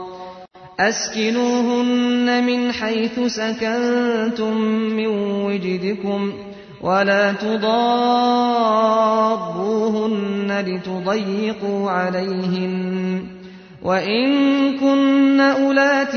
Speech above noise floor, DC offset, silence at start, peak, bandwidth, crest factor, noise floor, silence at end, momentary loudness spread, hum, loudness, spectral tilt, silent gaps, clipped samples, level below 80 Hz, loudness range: 21 dB; under 0.1%; 0 s; -4 dBFS; 6.6 kHz; 14 dB; -39 dBFS; 0 s; 8 LU; none; -19 LUFS; -5 dB/octave; none; under 0.1%; -60 dBFS; 4 LU